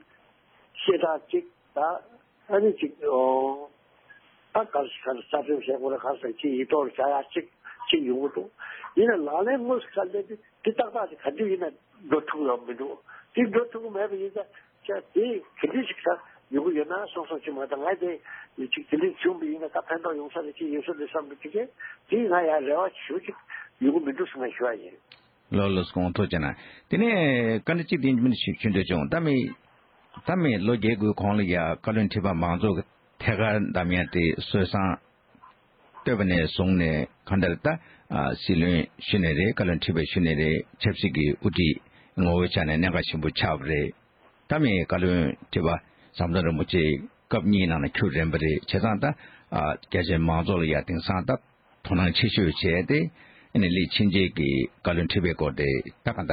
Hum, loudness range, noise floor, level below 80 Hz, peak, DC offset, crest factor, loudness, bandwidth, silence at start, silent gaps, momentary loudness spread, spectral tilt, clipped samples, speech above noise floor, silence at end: none; 5 LU; -61 dBFS; -46 dBFS; -8 dBFS; under 0.1%; 18 dB; -26 LUFS; 5.2 kHz; 0.75 s; none; 10 LU; -11 dB/octave; under 0.1%; 35 dB; 0 s